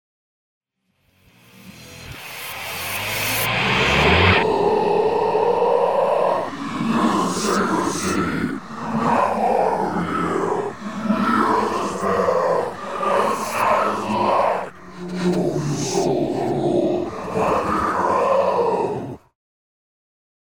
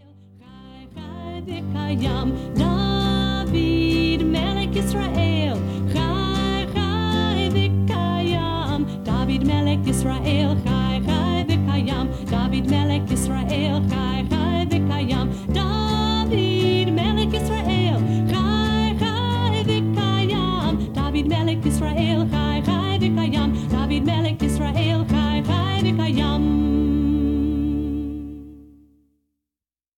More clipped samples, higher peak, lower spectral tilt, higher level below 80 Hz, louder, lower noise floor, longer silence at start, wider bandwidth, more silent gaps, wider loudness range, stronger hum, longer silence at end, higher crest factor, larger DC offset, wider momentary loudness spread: neither; first, -2 dBFS vs -8 dBFS; second, -5 dB/octave vs -6.5 dB/octave; second, -44 dBFS vs -32 dBFS; about the same, -20 LUFS vs -21 LUFS; second, -66 dBFS vs under -90 dBFS; first, 1.5 s vs 0.5 s; first, over 20 kHz vs 16 kHz; neither; first, 4 LU vs 1 LU; neither; about the same, 1.4 s vs 1.35 s; about the same, 18 dB vs 14 dB; first, 0.6% vs under 0.1%; first, 10 LU vs 4 LU